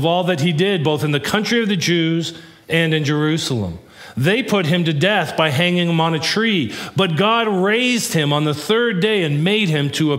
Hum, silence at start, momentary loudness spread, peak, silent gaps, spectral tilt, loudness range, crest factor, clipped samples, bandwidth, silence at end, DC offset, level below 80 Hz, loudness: none; 0 s; 5 LU; 0 dBFS; none; -5 dB/octave; 2 LU; 16 dB; under 0.1%; 16 kHz; 0 s; under 0.1%; -56 dBFS; -17 LUFS